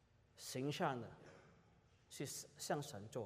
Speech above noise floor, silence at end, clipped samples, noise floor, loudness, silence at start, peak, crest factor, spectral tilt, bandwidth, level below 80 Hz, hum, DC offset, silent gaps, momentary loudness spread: 26 dB; 0 s; under 0.1%; -71 dBFS; -46 LUFS; 0.35 s; -26 dBFS; 22 dB; -4.5 dB/octave; 15.5 kHz; -80 dBFS; none; under 0.1%; none; 19 LU